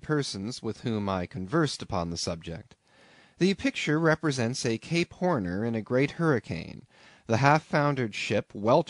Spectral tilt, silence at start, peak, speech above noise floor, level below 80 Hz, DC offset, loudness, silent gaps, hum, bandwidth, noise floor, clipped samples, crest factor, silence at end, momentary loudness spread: -5.5 dB/octave; 0.05 s; -6 dBFS; 30 dB; -58 dBFS; under 0.1%; -28 LUFS; none; none; 11 kHz; -58 dBFS; under 0.1%; 22 dB; 0.05 s; 10 LU